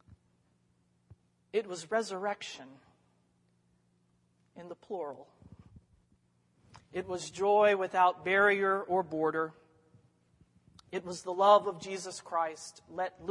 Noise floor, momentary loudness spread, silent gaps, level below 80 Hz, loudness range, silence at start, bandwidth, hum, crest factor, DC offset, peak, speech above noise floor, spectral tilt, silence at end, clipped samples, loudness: -72 dBFS; 18 LU; none; -74 dBFS; 19 LU; 1.55 s; 11.5 kHz; none; 24 dB; under 0.1%; -10 dBFS; 41 dB; -4 dB/octave; 0 s; under 0.1%; -31 LUFS